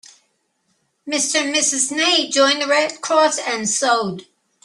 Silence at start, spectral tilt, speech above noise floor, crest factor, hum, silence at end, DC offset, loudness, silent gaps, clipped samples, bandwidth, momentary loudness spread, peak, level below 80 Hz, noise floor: 1.05 s; -1 dB/octave; 49 dB; 16 dB; none; 0.4 s; under 0.1%; -17 LUFS; none; under 0.1%; 12.5 kHz; 6 LU; -2 dBFS; -70 dBFS; -67 dBFS